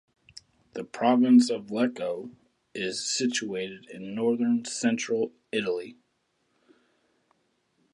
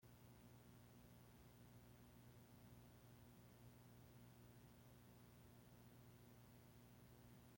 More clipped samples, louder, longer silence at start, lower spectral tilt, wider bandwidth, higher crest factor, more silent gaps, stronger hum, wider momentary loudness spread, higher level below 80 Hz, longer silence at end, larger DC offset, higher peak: neither; first, -27 LUFS vs -67 LUFS; first, 0.75 s vs 0 s; second, -4 dB/octave vs -5.5 dB/octave; second, 11 kHz vs 16.5 kHz; first, 20 dB vs 14 dB; neither; second, none vs 60 Hz at -70 dBFS; first, 19 LU vs 1 LU; about the same, -76 dBFS vs -78 dBFS; first, 2 s vs 0 s; neither; first, -10 dBFS vs -54 dBFS